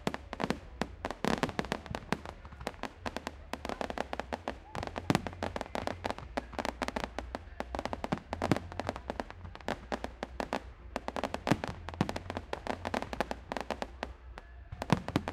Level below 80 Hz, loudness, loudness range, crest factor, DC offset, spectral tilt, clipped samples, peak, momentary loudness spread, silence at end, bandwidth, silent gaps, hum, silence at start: -50 dBFS; -38 LUFS; 1 LU; 32 dB; under 0.1%; -5.5 dB/octave; under 0.1%; -6 dBFS; 10 LU; 0 s; 16 kHz; none; none; 0 s